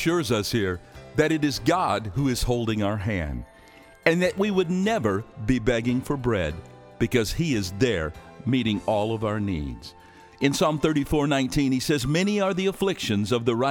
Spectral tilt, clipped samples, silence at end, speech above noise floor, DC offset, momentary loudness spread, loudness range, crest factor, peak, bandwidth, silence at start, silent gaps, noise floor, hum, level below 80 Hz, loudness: -5.5 dB/octave; under 0.1%; 0 s; 26 dB; under 0.1%; 7 LU; 2 LU; 20 dB; -4 dBFS; 19 kHz; 0 s; none; -50 dBFS; none; -42 dBFS; -25 LUFS